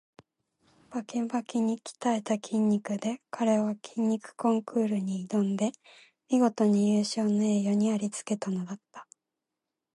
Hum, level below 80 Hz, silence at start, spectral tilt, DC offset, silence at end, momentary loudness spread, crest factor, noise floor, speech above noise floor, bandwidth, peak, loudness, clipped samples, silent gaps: none; -78 dBFS; 0.9 s; -6 dB/octave; under 0.1%; 0.95 s; 8 LU; 16 dB; -87 dBFS; 59 dB; 11.5 kHz; -12 dBFS; -29 LUFS; under 0.1%; none